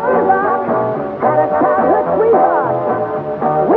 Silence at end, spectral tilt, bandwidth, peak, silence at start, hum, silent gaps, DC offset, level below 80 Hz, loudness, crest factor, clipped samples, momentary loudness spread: 0 s; -10.5 dB/octave; 4.6 kHz; -2 dBFS; 0 s; none; none; under 0.1%; -52 dBFS; -14 LUFS; 12 dB; under 0.1%; 6 LU